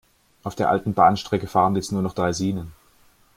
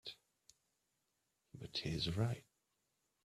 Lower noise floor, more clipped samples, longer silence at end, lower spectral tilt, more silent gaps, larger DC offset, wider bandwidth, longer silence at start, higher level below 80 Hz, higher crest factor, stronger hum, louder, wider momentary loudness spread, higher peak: second, -57 dBFS vs -85 dBFS; neither; second, 0.65 s vs 0.85 s; about the same, -6 dB/octave vs -5.5 dB/octave; neither; neither; first, 16 kHz vs 14 kHz; first, 0.45 s vs 0.05 s; first, -52 dBFS vs -66 dBFS; about the same, 20 dB vs 22 dB; neither; first, -22 LUFS vs -42 LUFS; second, 15 LU vs 21 LU; first, -2 dBFS vs -24 dBFS